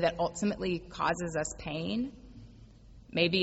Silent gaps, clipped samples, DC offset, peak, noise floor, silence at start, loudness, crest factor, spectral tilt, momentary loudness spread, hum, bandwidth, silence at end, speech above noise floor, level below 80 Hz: none; under 0.1%; under 0.1%; -12 dBFS; -53 dBFS; 0 s; -33 LUFS; 20 dB; -4.5 dB/octave; 15 LU; none; 8.2 kHz; 0 s; 22 dB; -54 dBFS